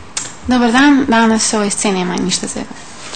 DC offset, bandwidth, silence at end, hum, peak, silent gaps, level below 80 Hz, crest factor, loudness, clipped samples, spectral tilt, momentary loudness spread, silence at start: 2%; 9.4 kHz; 0 s; none; 0 dBFS; none; -42 dBFS; 14 dB; -13 LUFS; under 0.1%; -3.5 dB/octave; 14 LU; 0 s